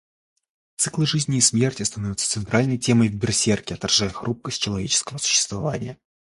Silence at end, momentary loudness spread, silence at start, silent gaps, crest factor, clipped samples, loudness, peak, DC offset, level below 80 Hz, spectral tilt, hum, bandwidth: 0.35 s; 9 LU; 0.8 s; none; 20 dB; under 0.1%; -21 LUFS; -4 dBFS; under 0.1%; -50 dBFS; -3.5 dB/octave; none; 11.5 kHz